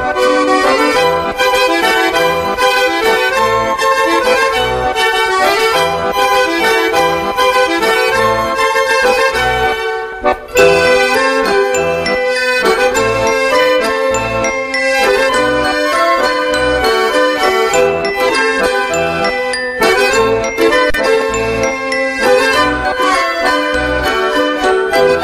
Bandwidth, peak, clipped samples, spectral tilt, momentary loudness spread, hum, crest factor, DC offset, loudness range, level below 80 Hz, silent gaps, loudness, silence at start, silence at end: 15.5 kHz; 0 dBFS; under 0.1%; -3 dB/octave; 4 LU; none; 12 dB; under 0.1%; 1 LU; -36 dBFS; none; -12 LUFS; 0 s; 0 s